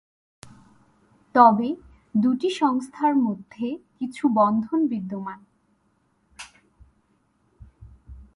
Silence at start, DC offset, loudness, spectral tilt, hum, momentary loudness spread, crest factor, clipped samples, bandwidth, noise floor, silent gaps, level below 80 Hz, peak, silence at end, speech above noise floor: 1.35 s; under 0.1%; -23 LUFS; -6.5 dB/octave; none; 22 LU; 24 dB; under 0.1%; 11.5 kHz; -67 dBFS; none; -56 dBFS; -2 dBFS; 0.1 s; 45 dB